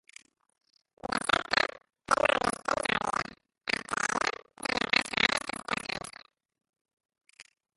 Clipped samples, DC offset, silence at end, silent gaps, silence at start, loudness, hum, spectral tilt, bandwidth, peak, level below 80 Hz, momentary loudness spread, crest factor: under 0.1%; under 0.1%; 0.35 s; 6.81-6.85 s; 1.05 s; -29 LUFS; none; -2 dB/octave; 12 kHz; -6 dBFS; -60 dBFS; 12 LU; 26 dB